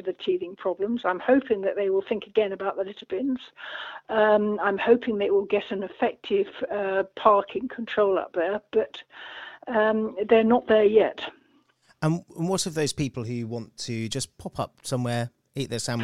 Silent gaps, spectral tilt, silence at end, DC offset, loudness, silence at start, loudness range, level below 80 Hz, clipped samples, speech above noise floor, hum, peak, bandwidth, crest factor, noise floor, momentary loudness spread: none; -5 dB/octave; 0 s; under 0.1%; -25 LUFS; 0.05 s; 6 LU; -60 dBFS; under 0.1%; 38 dB; none; -4 dBFS; 13.5 kHz; 20 dB; -63 dBFS; 13 LU